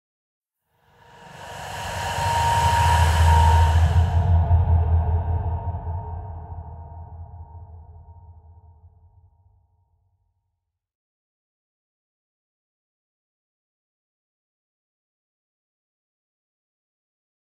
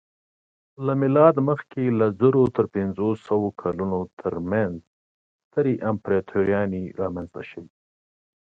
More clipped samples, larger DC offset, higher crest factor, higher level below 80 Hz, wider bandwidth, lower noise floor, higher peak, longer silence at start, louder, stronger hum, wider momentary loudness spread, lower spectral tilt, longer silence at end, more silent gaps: neither; neither; about the same, 20 dB vs 20 dB; first, -30 dBFS vs -52 dBFS; first, 13 kHz vs 4.6 kHz; second, -79 dBFS vs under -90 dBFS; about the same, -6 dBFS vs -4 dBFS; first, 1.25 s vs 0.8 s; first, -20 LUFS vs -23 LUFS; neither; first, 23 LU vs 12 LU; second, -5.5 dB/octave vs -10.5 dB/octave; first, 9.2 s vs 0.9 s; second, none vs 4.13-4.17 s, 4.87-5.51 s